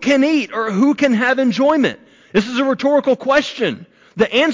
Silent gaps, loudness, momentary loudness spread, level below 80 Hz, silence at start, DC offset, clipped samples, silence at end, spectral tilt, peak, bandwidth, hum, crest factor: none; -16 LUFS; 6 LU; -58 dBFS; 0 s; under 0.1%; under 0.1%; 0 s; -5 dB/octave; -4 dBFS; 7.6 kHz; none; 12 dB